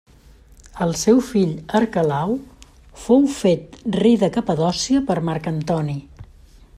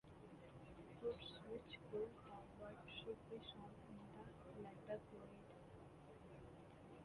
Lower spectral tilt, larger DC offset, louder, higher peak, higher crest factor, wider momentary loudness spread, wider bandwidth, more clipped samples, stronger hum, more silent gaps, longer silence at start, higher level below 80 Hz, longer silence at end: about the same, -6 dB/octave vs -6.5 dB/octave; neither; first, -19 LUFS vs -56 LUFS; first, -2 dBFS vs -36 dBFS; about the same, 18 dB vs 18 dB; second, 9 LU vs 12 LU; first, 14 kHz vs 11 kHz; neither; neither; neither; first, 0.75 s vs 0.05 s; first, -46 dBFS vs -72 dBFS; first, 0.55 s vs 0 s